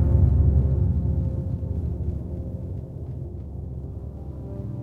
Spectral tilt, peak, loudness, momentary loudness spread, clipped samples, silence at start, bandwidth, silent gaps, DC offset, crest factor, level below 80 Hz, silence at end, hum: -12 dB/octave; -8 dBFS; -27 LUFS; 16 LU; under 0.1%; 0 s; 1.8 kHz; none; under 0.1%; 16 dB; -28 dBFS; 0 s; none